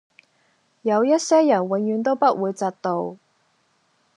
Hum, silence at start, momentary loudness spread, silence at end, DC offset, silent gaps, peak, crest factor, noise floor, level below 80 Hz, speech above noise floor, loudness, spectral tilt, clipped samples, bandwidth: none; 0.85 s; 10 LU; 1 s; under 0.1%; none; -6 dBFS; 16 dB; -65 dBFS; -84 dBFS; 45 dB; -21 LUFS; -5.5 dB/octave; under 0.1%; 10.5 kHz